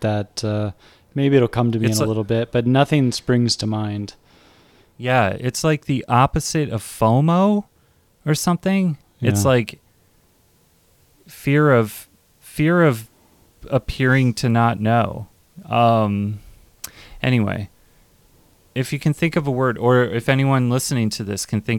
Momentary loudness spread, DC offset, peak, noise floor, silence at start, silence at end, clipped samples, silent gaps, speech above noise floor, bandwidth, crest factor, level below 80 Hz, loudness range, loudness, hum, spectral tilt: 13 LU; under 0.1%; -2 dBFS; -58 dBFS; 0 s; 0 s; under 0.1%; none; 39 dB; 18 kHz; 18 dB; -46 dBFS; 4 LU; -19 LUFS; none; -6 dB/octave